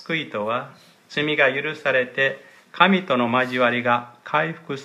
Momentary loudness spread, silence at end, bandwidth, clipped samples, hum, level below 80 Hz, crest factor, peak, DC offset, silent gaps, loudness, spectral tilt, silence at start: 9 LU; 0 s; 12.5 kHz; under 0.1%; none; -74 dBFS; 22 dB; 0 dBFS; under 0.1%; none; -21 LUFS; -6 dB/octave; 0 s